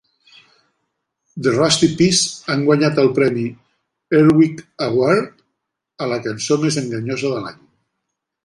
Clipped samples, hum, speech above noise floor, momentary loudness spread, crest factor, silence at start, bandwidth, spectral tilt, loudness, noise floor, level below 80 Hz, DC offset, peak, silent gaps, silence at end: under 0.1%; none; 61 dB; 12 LU; 16 dB; 1.35 s; 11.5 kHz; -4.5 dB/octave; -17 LUFS; -77 dBFS; -56 dBFS; under 0.1%; -2 dBFS; none; 0.9 s